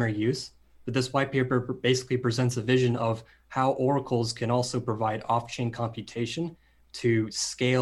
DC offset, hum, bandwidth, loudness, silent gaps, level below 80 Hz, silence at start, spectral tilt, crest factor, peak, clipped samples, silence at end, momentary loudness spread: under 0.1%; none; 12 kHz; -28 LUFS; none; -60 dBFS; 0 s; -5.5 dB/octave; 18 dB; -10 dBFS; under 0.1%; 0 s; 9 LU